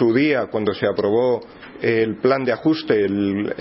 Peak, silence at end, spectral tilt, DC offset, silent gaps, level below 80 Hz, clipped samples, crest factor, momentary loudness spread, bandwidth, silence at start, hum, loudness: -4 dBFS; 0 s; -10.5 dB/octave; under 0.1%; none; -58 dBFS; under 0.1%; 16 dB; 4 LU; 5.8 kHz; 0 s; none; -20 LUFS